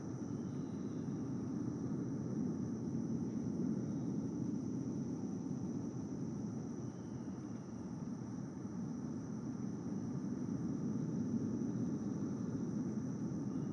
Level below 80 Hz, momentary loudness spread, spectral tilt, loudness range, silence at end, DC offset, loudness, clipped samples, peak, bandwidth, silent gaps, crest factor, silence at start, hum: -70 dBFS; 6 LU; -8.5 dB/octave; 4 LU; 0 s; under 0.1%; -42 LUFS; under 0.1%; -28 dBFS; 9.6 kHz; none; 14 dB; 0 s; none